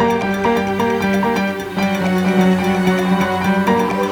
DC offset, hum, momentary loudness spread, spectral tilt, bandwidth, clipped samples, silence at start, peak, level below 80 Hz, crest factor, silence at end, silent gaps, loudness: under 0.1%; none; 4 LU; -6.5 dB/octave; 18 kHz; under 0.1%; 0 s; -2 dBFS; -46 dBFS; 14 dB; 0 s; none; -16 LUFS